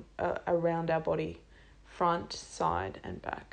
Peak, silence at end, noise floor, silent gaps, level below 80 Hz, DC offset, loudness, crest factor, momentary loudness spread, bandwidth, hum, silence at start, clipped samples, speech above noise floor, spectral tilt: -16 dBFS; 0.1 s; -55 dBFS; none; -56 dBFS; under 0.1%; -33 LUFS; 18 dB; 11 LU; 9.6 kHz; none; 0 s; under 0.1%; 23 dB; -5.5 dB/octave